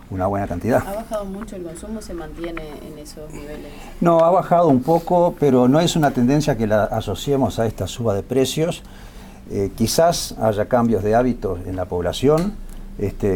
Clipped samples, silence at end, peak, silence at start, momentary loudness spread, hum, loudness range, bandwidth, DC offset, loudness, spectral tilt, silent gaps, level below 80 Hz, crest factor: under 0.1%; 0 s; -2 dBFS; 0 s; 18 LU; none; 9 LU; 18 kHz; under 0.1%; -19 LUFS; -6 dB/octave; none; -38 dBFS; 18 dB